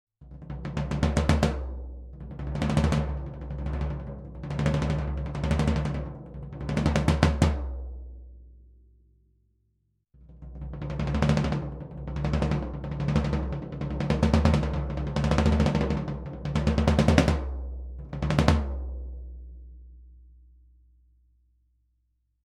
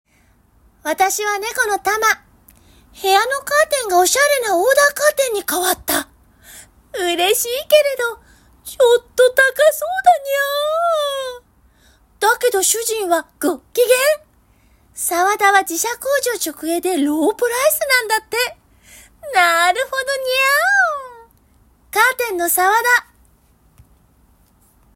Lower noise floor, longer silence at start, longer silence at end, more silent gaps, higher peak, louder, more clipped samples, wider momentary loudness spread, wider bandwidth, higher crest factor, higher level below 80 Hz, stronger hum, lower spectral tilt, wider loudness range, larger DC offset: first, -73 dBFS vs -55 dBFS; second, 0.2 s vs 0.85 s; first, 2.2 s vs 1.95 s; neither; about the same, 0 dBFS vs 0 dBFS; second, -27 LUFS vs -16 LUFS; neither; first, 18 LU vs 10 LU; second, 11.5 kHz vs 16.5 kHz; first, 28 dB vs 18 dB; first, -34 dBFS vs -54 dBFS; neither; first, -7 dB/octave vs -0.5 dB/octave; first, 7 LU vs 3 LU; neither